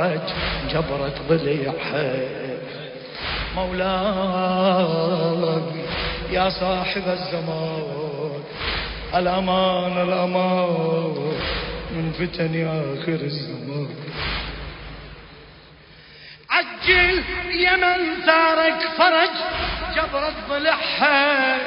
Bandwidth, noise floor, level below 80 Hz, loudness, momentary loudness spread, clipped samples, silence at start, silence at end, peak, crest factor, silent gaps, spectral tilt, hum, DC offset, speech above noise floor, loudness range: 5.4 kHz; -46 dBFS; -40 dBFS; -21 LUFS; 13 LU; under 0.1%; 0 s; 0 s; -2 dBFS; 20 dB; none; -10 dB/octave; none; under 0.1%; 25 dB; 8 LU